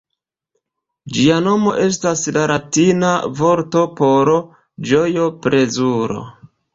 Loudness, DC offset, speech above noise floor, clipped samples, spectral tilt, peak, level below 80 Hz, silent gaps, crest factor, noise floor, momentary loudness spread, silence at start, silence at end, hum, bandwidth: -16 LUFS; under 0.1%; 64 dB; under 0.1%; -5 dB/octave; -2 dBFS; -54 dBFS; none; 16 dB; -79 dBFS; 5 LU; 1.05 s; 0.3 s; none; 8 kHz